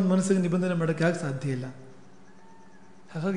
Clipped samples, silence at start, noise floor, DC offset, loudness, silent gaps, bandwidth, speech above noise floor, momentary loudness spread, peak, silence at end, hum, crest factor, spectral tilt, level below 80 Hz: under 0.1%; 0 s; -54 dBFS; 0.4%; -27 LUFS; none; 10.5 kHz; 28 dB; 17 LU; -10 dBFS; 0 s; none; 18 dB; -7 dB/octave; -70 dBFS